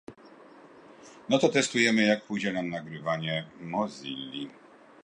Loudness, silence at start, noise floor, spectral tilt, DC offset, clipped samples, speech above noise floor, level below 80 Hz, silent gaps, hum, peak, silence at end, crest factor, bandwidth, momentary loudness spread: -28 LUFS; 0.1 s; -52 dBFS; -4 dB/octave; under 0.1%; under 0.1%; 24 dB; -72 dBFS; none; none; -8 dBFS; 0.5 s; 22 dB; 10.5 kHz; 15 LU